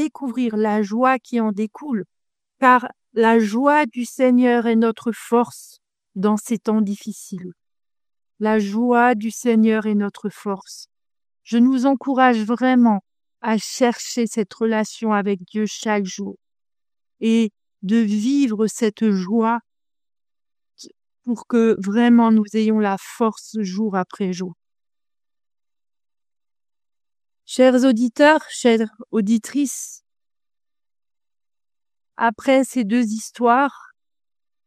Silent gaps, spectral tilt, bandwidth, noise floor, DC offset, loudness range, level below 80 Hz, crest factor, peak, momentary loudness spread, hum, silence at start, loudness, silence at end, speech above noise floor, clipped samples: none; -5.5 dB/octave; 14.5 kHz; under -90 dBFS; under 0.1%; 7 LU; -70 dBFS; 20 dB; 0 dBFS; 13 LU; none; 0 s; -19 LUFS; 0.9 s; over 72 dB; under 0.1%